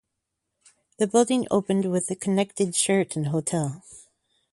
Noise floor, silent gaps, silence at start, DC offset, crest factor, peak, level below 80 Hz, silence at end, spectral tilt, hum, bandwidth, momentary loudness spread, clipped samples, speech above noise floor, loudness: -81 dBFS; none; 1 s; under 0.1%; 18 dB; -6 dBFS; -66 dBFS; 0.5 s; -5 dB/octave; none; 11.5 kHz; 7 LU; under 0.1%; 57 dB; -24 LUFS